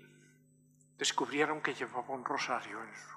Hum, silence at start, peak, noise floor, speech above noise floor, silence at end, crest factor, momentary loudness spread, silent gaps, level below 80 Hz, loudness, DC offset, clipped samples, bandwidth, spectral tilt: 50 Hz at -60 dBFS; 0 s; -16 dBFS; -66 dBFS; 30 dB; 0 s; 22 dB; 7 LU; none; -88 dBFS; -35 LUFS; under 0.1%; under 0.1%; 14.5 kHz; -2 dB/octave